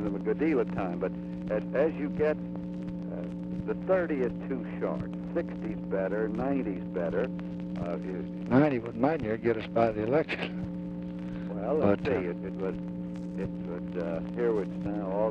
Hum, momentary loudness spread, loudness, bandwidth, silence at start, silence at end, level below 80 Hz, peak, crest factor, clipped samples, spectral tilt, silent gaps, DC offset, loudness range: none; 9 LU; -31 LUFS; 6.4 kHz; 0 s; 0 s; -54 dBFS; -10 dBFS; 20 dB; under 0.1%; -9 dB/octave; none; under 0.1%; 4 LU